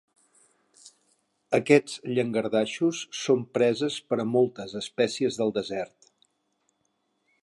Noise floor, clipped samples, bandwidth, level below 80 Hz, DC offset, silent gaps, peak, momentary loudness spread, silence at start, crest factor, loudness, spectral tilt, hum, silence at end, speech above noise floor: -74 dBFS; under 0.1%; 11.5 kHz; -72 dBFS; under 0.1%; none; -6 dBFS; 11 LU; 1.5 s; 22 dB; -26 LUFS; -5 dB/octave; none; 1.55 s; 49 dB